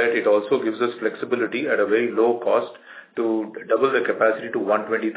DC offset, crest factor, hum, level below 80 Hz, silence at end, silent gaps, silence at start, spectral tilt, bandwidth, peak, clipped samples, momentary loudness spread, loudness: under 0.1%; 16 dB; none; -80 dBFS; 0 s; none; 0 s; -9 dB/octave; 4 kHz; -6 dBFS; under 0.1%; 7 LU; -22 LUFS